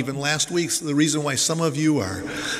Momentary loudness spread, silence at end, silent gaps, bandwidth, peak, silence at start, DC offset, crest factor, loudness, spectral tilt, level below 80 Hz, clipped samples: 4 LU; 0 s; none; 16 kHz; -4 dBFS; 0 s; under 0.1%; 18 dB; -22 LUFS; -3.5 dB/octave; -56 dBFS; under 0.1%